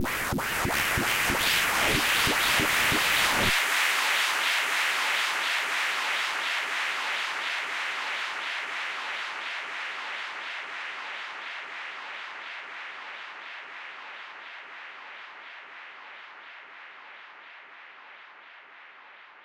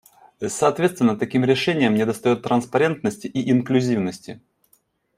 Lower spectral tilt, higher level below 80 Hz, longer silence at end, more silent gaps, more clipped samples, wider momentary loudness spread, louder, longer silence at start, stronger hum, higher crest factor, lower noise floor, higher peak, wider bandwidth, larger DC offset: second, -1.5 dB/octave vs -5.5 dB/octave; first, -52 dBFS vs -62 dBFS; second, 0 s vs 0.8 s; neither; neither; first, 22 LU vs 10 LU; second, -26 LUFS vs -21 LUFS; second, 0 s vs 0.4 s; neither; about the same, 18 dB vs 18 dB; second, -50 dBFS vs -63 dBFS; second, -10 dBFS vs -4 dBFS; about the same, 16 kHz vs 15 kHz; neither